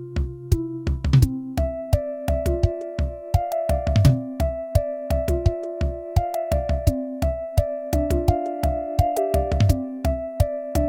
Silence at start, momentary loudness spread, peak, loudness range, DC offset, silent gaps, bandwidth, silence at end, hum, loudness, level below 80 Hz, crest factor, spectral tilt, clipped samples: 0 s; 7 LU; -4 dBFS; 1 LU; under 0.1%; none; 17 kHz; 0 s; none; -24 LUFS; -28 dBFS; 18 dB; -7.5 dB/octave; under 0.1%